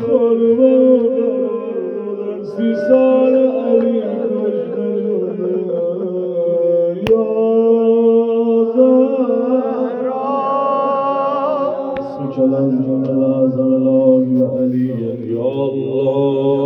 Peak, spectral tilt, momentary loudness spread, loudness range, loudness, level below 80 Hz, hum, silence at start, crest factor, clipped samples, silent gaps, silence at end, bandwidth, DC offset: 0 dBFS; -10 dB/octave; 8 LU; 4 LU; -15 LUFS; -58 dBFS; none; 0 s; 14 dB; under 0.1%; none; 0 s; 5.6 kHz; under 0.1%